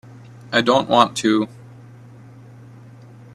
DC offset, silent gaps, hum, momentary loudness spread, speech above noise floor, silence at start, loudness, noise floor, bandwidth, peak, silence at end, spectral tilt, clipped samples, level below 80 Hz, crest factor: under 0.1%; none; none; 6 LU; 26 dB; 0.5 s; -18 LUFS; -42 dBFS; 13.5 kHz; 0 dBFS; 1.9 s; -4.5 dB/octave; under 0.1%; -62 dBFS; 22 dB